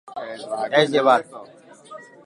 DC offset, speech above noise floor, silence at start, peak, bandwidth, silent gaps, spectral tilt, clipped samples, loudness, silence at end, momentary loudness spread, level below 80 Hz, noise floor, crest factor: under 0.1%; 23 dB; 0.05 s; -4 dBFS; 11.5 kHz; none; -4.5 dB/octave; under 0.1%; -19 LUFS; 0.2 s; 24 LU; -76 dBFS; -43 dBFS; 20 dB